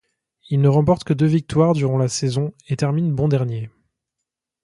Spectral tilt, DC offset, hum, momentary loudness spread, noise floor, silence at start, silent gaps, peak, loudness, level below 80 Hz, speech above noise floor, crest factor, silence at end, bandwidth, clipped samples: -7 dB/octave; under 0.1%; none; 9 LU; -83 dBFS; 0.5 s; none; -2 dBFS; -19 LUFS; -50 dBFS; 64 dB; 18 dB; 0.95 s; 11.5 kHz; under 0.1%